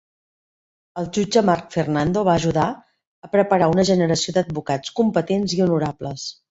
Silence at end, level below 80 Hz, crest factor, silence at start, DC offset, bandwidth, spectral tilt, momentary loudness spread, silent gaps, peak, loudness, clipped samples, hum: 0.2 s; -52 dBFS; 18 dB; 0.95 s; under 0.1%; 8 kHz; -5.5 dB/octave; 11 LU; 3.07-3.22 s; -2 dBFS; -20 LUFS; under 0.1%; none